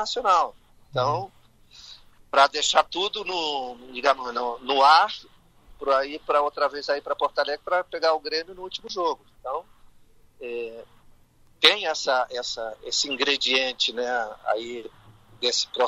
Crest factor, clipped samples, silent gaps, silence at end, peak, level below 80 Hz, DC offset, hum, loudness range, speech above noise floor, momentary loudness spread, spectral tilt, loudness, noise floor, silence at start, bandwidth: 26 dB; under 0.1%; none; 0 s; 0 dBFS; -60 dBFS; under 0.1%; none; 6 LU; 31 dB; 16 LU; -1.5 dB/octave; -24 LUFS; -56 dBFS; 0 s; 14.5 kHz